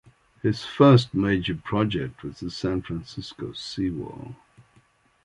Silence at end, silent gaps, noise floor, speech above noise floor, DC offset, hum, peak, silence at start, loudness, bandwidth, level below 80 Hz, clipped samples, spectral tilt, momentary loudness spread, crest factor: 0.9 s; none; -61 dBFS; 37 dB; under 0.1%; none; -4 dBFS; 0.45 s; -24 LUFS; 11 kHz; -50 dBFS; under 0.1%; -7 dB/octave; 19 LU; 22 dB